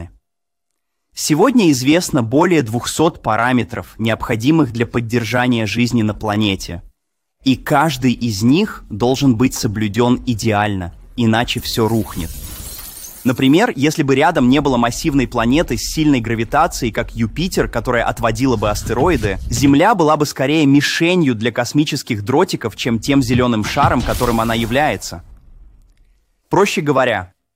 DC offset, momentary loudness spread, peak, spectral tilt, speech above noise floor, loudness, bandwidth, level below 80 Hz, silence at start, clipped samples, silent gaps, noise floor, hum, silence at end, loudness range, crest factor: under 0.1%; 9 LU; 0 dBFS; -5.5 dB/octave; 66 dB; -16 LUFS; 16 kHz; -34 dBFS; 0 s; under 0.1%; none; -81 dBFS; none; 0.3 s; 4 LU; 16 dB